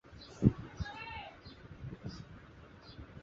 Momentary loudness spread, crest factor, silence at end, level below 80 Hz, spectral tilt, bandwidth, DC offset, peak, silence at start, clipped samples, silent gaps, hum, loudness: 22 LU; 28 dB; 0 s; -52 dBFS; -7 dB/octave; 7.6 kHz; under 0.1%; -12 dBFS; 0.05 s; under 0.1%; none; none; -38 LUFS